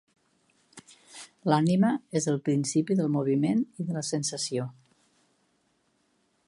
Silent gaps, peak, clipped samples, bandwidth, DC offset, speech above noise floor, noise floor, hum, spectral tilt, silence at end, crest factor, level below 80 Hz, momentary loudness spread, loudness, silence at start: none; -8 dBFS; under 0.1%; 11.5 kHz; under 0.1%; 45 dB; -71 dBFS; none; -5.5 dB/octave; 1.75 s; 22 dB; -74 dBFS; 11 LU; -27 LUFS; 0.75 s